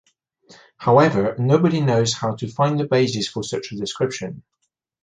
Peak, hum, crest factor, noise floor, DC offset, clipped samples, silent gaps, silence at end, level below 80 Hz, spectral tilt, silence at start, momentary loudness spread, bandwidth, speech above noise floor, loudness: -2 dBFS; none; 18 dB; -53 dBFS; under 0.1%; under 0.1%; none; 0.65 s; -56 dBFS; -5.5 dB/octave; 0.8 s; 12 LU; 9.6 kHz; 34 dB; -20 LUFS